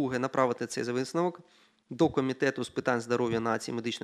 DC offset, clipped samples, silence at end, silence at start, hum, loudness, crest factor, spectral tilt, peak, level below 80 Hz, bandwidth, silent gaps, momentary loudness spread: under 0.1%; under 0.1%; 0.05 s; 0 s; none; -30 LUFS; 20 dB; -5.5 dB/octave; -10 dBFS; -66 dBFS; 13.5 kHz; none; 5 LU